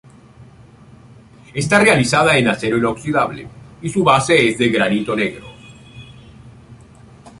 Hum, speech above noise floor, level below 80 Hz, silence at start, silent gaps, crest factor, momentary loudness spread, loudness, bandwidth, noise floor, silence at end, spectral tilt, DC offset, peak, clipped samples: none; 28 dB; -48 dBFS; 0.4 s; none; 18 dB; 16 LU; -15 LUFS; 11.5 kHz; -44 dBFS; 0.1 s; -4.5 dB/octave; under 0.1%; 0 dBFS; under 0.1%